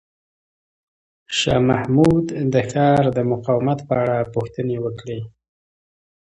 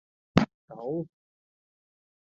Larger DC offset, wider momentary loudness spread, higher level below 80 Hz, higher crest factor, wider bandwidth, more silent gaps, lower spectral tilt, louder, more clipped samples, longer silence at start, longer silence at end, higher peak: neither; about the same, 11 LU vs 13 LU; first, -46 dBFS vs -56 dBFS; second, 18 dB vs 32 dB; first, 11 kHz vs 7.8 kHz; second, none vs 0.54-0.68 s; about the same, -6.5 dB/octave vs -7 dB/octave; first, -19 LUFS vs -30 LUFS; neither; first, 1.3 s vs 0.35 s; second, 1.05 s vs 1.3 s; about the same, -2 dBFS vs -2 dBFS